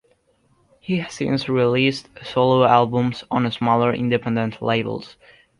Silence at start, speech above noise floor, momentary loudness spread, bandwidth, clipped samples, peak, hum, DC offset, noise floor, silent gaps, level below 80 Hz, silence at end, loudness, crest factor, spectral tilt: 0.9 s; 42 dB; 10 LU; 11 kHz; under 0.1%; -2 dBFS; none; under 0.1%; -62 dBFS; none; -56 dBFS; 0.5 s; -20 LUFS; 20 dB; -6.5 dB/octave